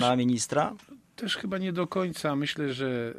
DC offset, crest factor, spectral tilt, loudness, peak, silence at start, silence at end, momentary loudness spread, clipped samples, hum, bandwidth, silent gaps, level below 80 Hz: under 0.1%; 18 dB; -4.5 dB/octave; -29 LUFS; -10 dBFS; 0 s; 0 s; 7 LU; under 0.1%; none; 14.5 kHz; none; -66 dBFS